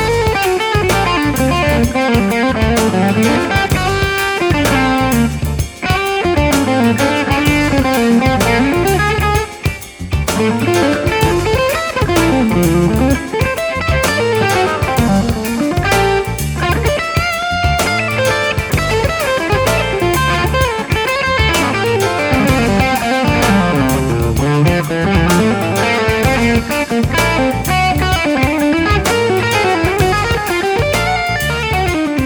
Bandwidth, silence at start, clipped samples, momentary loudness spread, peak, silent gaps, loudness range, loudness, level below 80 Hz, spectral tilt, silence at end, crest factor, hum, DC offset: over 20 kHz; 0 s; under 0.1%; 3 LU; 0 dBFS; none; 1 LU; -13 LUFS; -26 dBFS; -5 dB/octave; 0 s; 12 dB; none; under 0.1%